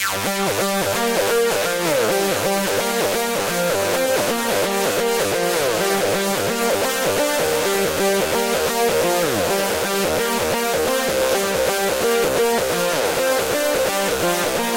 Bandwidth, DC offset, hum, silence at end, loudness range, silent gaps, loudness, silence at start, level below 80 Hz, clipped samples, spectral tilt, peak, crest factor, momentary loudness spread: 16 kHz; under 0.1%; none; 0 s; 0 LU; none; -19 LUFS; 0 s; -48 dBFS; under 0.1%; -2.5 dB/octave; -8 dBFS; 10 dB; 2 LU